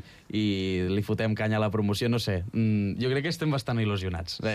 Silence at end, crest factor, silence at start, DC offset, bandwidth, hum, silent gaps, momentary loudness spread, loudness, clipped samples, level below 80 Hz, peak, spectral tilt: 0 s; 10 dB; 0.05 s; under 0.1%; 14.5 kHz; none; none; 3 LU; -28 LUFS; under 0.1%; -52 dBFS; -16 dBFS; -6.5 dB/octave